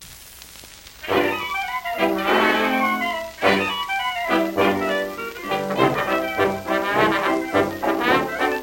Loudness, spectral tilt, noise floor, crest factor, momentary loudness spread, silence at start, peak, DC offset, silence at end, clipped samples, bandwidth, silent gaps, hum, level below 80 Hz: -21 LUFS; -4.5 dB/octave; -42 dBFS; 20 dB; 11 LU; 0 s; -2 dBFS; under 0.1%; 0 s; under 0.1%; 16.5 kHz; none; none; -52 dBFS